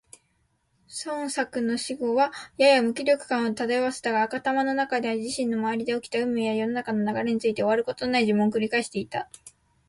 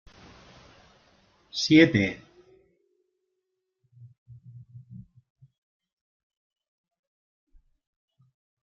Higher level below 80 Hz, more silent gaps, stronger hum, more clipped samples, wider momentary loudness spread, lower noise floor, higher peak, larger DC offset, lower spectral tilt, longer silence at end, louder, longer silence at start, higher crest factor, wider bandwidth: about the same, -66 dBFS vs -64 dBFS; second, none vs 4.18-4.26 s; neither; neither; second, 8 LU vs 30 LU; second, -70 dBFS vs -81 dBFS; second, -8 dBFS vs -4 dBFS; neither; about the same, -4.5 dB/octave vs -4.5 dB/octave; second, 0.4 s vs 3.6 s; second, -25 LUFS vs -22 LUFS; second, 0.9 s vs 1.55 s; second, 18 dB vs 26 dB; first, 11.5 kHz vs 7.2 kHz